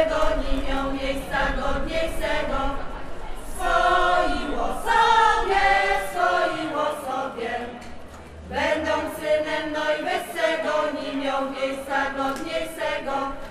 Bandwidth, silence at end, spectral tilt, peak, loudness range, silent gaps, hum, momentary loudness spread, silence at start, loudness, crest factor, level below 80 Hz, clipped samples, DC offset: 15.5 kHz; 0 s; -4 dB/octave; -6 dBFS; 6 LU; none; none; 12 LU; 0 s; -24 LUFS; 18 dB; -34 dBFS; under 0.1%; under 0.1%